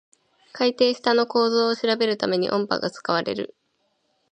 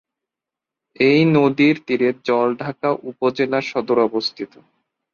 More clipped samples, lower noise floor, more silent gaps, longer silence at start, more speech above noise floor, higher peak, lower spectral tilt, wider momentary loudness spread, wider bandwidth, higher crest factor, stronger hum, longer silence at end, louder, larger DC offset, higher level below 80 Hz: neither; second, -71 dBFS vs -86 dBFS; neither; second, 0.55 s vs 1 s; second, 48 dB vs 68 dB; about the same, -4 dBFS vs -4 dBFS; second, -5 dB/octave vs -7 dB/octave; second, 6 LU vs 9 LU; first, 9.2 kHz vs 7 kHz; about the same, 18 dB vs 16 dB; neither; first, 0.85 s vs 0.7 s; second, -22 LUFS vs -18 LUFS; neither; second, -70 dBFS vs -62 dBFS